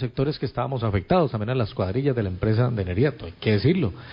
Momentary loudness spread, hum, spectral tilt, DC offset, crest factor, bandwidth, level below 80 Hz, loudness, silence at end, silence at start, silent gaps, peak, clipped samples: 5 LU; none; -11 dB/octave; under 0.1%; 16 dB; 5.4 kHz; -40 dBFS; -24 LUFS; 0 s; 0 s; none; -6 dBFS; under 0.1%